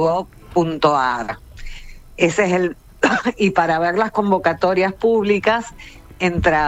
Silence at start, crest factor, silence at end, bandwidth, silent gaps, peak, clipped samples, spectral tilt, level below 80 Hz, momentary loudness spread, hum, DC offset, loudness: 0 s; 16 dB; 0 s; 15 kHz; none; -2 dBFS; under 0.1%; -5.5 dB/octave; -40 dBFS; 10 LU; none; under 0.1%; -18 LUFS